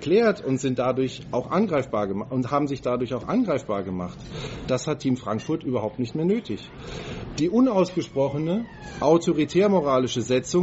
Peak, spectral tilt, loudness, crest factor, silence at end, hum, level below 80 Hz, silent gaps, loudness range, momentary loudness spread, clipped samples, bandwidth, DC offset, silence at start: -6 dBFS; -6 dB/octave; -24 LUFS; 18 dB; 0 s; none; -50 dBFS; none; 5 LU; 13 LU; under 0.1%; 8 kHz; under 0.1%; 0 s